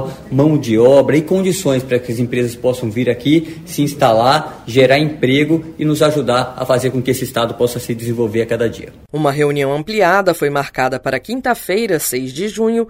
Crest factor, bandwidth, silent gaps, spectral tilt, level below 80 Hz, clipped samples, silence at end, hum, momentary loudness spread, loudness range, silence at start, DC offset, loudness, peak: 14 dB; 16 kHz; none; -5.5 dB/octave; -46 dBFS; under 0.1%; 0 s; none; 8 LU; 3 LU; 0 s; under 0.1%; -15 LUFS; 0 dBFS